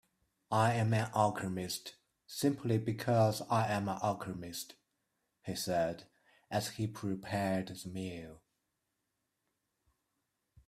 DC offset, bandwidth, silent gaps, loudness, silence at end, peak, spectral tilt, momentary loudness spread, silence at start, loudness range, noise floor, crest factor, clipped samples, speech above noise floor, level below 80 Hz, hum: under 0.1%; 15.5 kHz; none; -35 LUFS; 2.3 s; -16 dBFS; -5.5 dB/octave; 14 LU; 0.5 s; 8 LU; -85 dBFS; 20 dB; under 0.1%; 50 dB; -70 dBFS; none